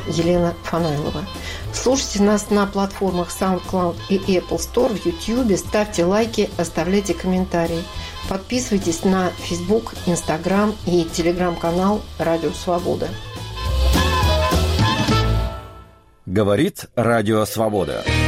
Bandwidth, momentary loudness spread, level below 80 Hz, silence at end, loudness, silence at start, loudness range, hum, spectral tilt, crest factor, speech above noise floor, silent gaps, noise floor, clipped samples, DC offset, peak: 16 kHz; 8 LU; -30 dBFS; 0 s; -20 LUFS; 0 s; 2 LU; none; -5.5 dB/octave; 12 dB; 26 dB; none; -45 dBFS; under 0.1%; under 0.1%; -6 dBFS